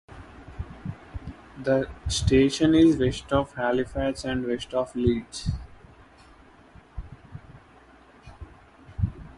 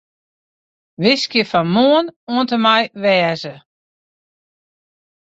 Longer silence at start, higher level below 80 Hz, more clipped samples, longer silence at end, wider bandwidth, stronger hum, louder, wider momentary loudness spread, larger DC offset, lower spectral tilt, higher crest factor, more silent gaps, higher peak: second, 0.1 s vs 1 s; first, -40 dBFS vs -62 dBFS; neither; second, 0.05 s vs 1.65 s; first, 11.5 kHz vs 8 kHz; neither; second, -25 LUFS vs -15 LUFS; first, 25 LU vs 7 LU; neither; about the same, -6 dB/octave vs -5.5 dB/octave; about the same, 20 dB vs 18 dB; second, none vs 2.16-2.27 s; second, -8 dBFS vs -2 dBFS